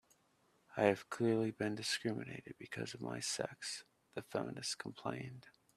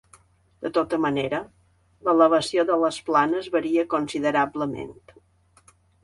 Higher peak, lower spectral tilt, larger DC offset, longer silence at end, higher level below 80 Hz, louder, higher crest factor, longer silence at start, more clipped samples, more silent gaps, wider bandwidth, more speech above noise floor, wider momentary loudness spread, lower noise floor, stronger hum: second, -14 dBFS vs -4 dBFS; about the same, -4 dB/octave vs -5 dB/octave; neither; second, 0.25 s vs 1.1 s; second, -78 dBFS vs -62 dBFS; second, -40 LUFS vs -23 LUFS; first, 26 dB vs 20 dB; about the same, 0.7 s vs 0.6 s; neither; neither; first, 14.5 kHz vs 11.5 kHz; about the same, 35 dB vs 36 dB; first, 15 LU vs 11 LU; first, -75 dBFS vs -59 dBFS; neither